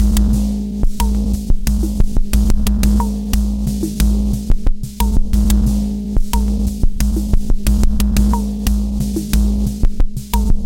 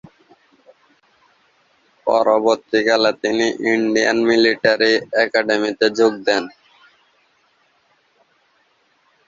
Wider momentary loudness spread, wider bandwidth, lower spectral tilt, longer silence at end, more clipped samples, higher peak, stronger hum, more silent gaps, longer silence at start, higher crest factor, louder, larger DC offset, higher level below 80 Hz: about the same, 5 LU vs 5 LU; first, 17 kHz vs 7.6 kHz; first, -6 dB/octave vs -3.5 dB/octave; second, 0 s vs 2.8 s; neither; about the same, 0 dBFS vs -2 dBFS; neither; neither; second, 0 s vs 2.05 s; about the same, 14 dB vs 18 dB; about the same, -18 LUFS vs -17 LUFS; neither; first, -16 dBFS vs -64 dBFS